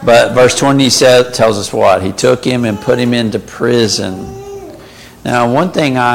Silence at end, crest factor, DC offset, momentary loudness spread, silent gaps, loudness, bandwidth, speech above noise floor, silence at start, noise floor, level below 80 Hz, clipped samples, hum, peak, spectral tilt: 0 s; 12 dB; under 0.1%; 16 LU; none; -11 LUFS; 17 kHz; 24 dB; 0 s; -35 dBFS; -42 dBFS; under 0.1%; none; 0 dBFS; -4.5 dB/octave